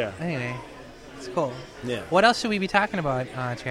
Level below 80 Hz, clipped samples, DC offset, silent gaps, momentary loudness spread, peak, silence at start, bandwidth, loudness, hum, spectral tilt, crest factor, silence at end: -52 dBFS; under 0.1%; under 0.1%; none; 19 LU; -4 dBFS; 0 s; 15.5 kHz; -25 LUFS; none; -5 dB/octave; 22 dB; 0 s